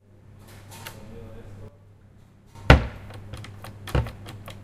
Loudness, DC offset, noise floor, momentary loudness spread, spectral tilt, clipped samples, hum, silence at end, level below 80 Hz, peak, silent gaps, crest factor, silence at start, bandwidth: -22 LUFS; under 0.1%; -52 dBFS; 28 LU; -6 dB/octave; under 0.1%; none; 0.05 s; -32 dBFS; 0 dBFS; none; 28 dB; 0.7 s; 15 kHz